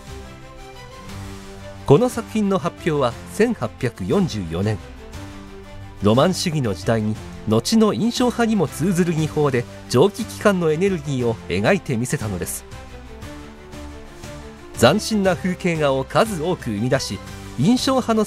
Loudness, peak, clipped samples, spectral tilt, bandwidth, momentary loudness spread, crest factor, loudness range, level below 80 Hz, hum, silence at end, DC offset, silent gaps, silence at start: -20 LUFS; 0 dBFS; under 0.1%; -5.5 dB/octave; 16 kHz; 21 LU; 20 dB; 5 LU; -42 dBFS; none; 0 s; under 0.1%; none; 0 s